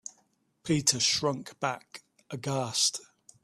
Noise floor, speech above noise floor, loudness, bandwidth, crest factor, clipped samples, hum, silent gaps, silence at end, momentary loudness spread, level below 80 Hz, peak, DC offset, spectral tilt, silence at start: -70 dBFS; 41 dB; -28 LUFS; 14.5 kHz; 22 dB; under 0.1%; none; none; 0.4 s; 21 LU; -66 dBFS; -10 dBFS; under 0.1%; -2.5 dB/octave; 0.05 s